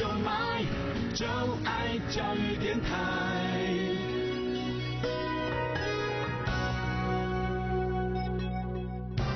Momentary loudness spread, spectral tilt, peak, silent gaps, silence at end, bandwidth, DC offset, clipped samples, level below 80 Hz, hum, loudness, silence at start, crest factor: 3 LU; -6 dB/octave; -20 dBFS; none; 0 s; 6.4 kHz; under 0.1%; under 0.1%; -42 dBFS; none; -32 LUFS; 0 s; 12 dB